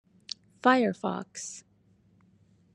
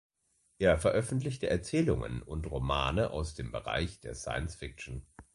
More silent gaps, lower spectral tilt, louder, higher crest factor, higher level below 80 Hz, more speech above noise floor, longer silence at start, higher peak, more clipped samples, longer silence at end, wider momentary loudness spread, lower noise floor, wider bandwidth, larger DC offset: neither; second, -4 dB/octave vs -5.5 dB/octave; first, -28 LUFS vs -33 LUFS; about the same, 24 dB vs 20 dB; second, -78 dBFS vs -44 dBFS; second, 37 dB vs 42 dB; about the same, 0.65 s vs 0.6 s; first, -8 dBFS vs -12 dBFS; neither; first, 1.15 s vs 0.15 s; first, 18 LU vs 13 LU; second, -64 dBFS vs -74 dBFS; about the same, 11 kHz vs 11.5 kHz; neither